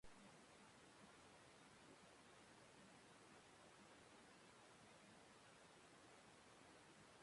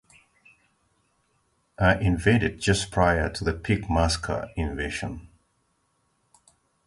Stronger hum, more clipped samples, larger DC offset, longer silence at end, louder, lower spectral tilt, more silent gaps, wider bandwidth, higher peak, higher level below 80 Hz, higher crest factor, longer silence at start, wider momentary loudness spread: neither; neither; neither; second, 0 s vs 1.6 s; second, -67 LUFS vs -25 LUFS; second, -3 dB/octave vs -5.5 dB/octave; neither; about the same, 11.5 kHz vs 11.5 kHz; second, -50 dBFS vs -6 dBFS; second, -86 dBFS vs -38 dBFS; about the same, 16 dB vs 20 dB; second, 0.05 s vs 1.8 s; second, 1 LU vs 9 LU